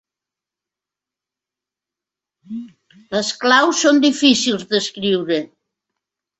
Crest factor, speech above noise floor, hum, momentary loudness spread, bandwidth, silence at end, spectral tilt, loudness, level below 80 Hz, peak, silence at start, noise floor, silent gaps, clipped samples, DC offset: 20 dB; 70 dB; none; 19 LU; 8.2 kHz; 0.95 s; -3 dB/octave; -16 LUFS; -64 dBFS; 0 dBFS; 2.5 s; -87 dBFS; none; under 0.1%; under 0.1%